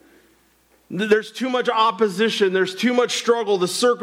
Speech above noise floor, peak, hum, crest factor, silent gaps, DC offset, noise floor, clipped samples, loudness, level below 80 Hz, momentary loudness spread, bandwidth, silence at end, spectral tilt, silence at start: 39 dB; -6 dBFS; none; 16 dB; none; under 0.1%; -59 dBFS; under 0.1%; -20 LUFS; -72 dBFS; 4 LU; 16 kHz; 0 s; -3.5 dB/octave; 0.9 s